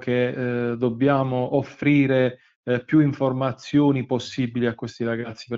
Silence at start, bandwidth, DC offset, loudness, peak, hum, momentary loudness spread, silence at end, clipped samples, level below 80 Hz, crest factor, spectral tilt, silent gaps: 0 s; 7.6 kHz; under 0.1%; -23 LUFS; -6 dBFS; none; 8 LU; 0 s; under 0.1%; -60 dBFS; 16 dB; -7.5 dB/octave; 2.56-2.63 s